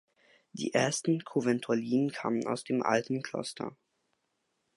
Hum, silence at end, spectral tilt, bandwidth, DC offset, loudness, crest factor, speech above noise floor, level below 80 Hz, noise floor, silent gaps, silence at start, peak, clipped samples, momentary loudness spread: none; 1.05 s; -5 dB/octave; 11.5 kHz; under 0.1%; -31 LUFS; 20 dB; 49 dB; -78 dBFS; -79 dBFS; none; 0.55 s; -12 dBFS; under 0.1%; 10 LU